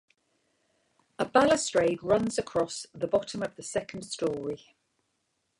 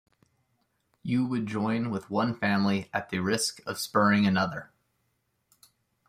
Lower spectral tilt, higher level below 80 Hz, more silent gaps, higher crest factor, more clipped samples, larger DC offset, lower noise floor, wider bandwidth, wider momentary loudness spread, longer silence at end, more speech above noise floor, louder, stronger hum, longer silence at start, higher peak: about the same, -4 dB/octave vs -5 dB/octave; first, -62 dBFS vs -68 dBFS; neither; about the same, 22 dB vs 20 dB; neither; neither; about the same, -78 dBFS vs -76 dBFS; second, 11.5 kHz vs 15.5 kHz; first, 12 LU vs 9 LU; second, 1.05 s vs 1.45 s; about the same, 49 dB vs 48 dB; about the same, -29 LUFS vs -28 LUFS; neither; first, 1.2 s vs 1.05 s; about the same, -8 dBFS vs -10 dBFS